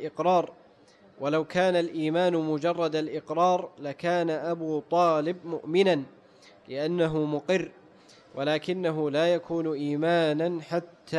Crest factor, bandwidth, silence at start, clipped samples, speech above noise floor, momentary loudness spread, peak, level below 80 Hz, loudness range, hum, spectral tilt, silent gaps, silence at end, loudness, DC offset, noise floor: 14 dB; 10.5 kHz; 0 s; under 0.1%; 30 dB; 8 LU; -12 dBFS; -70 dBFS; 2 LU; none; -6.5 dB/octave; none; 0 s; -27 LUFS; under 0.1%; -57 dBFS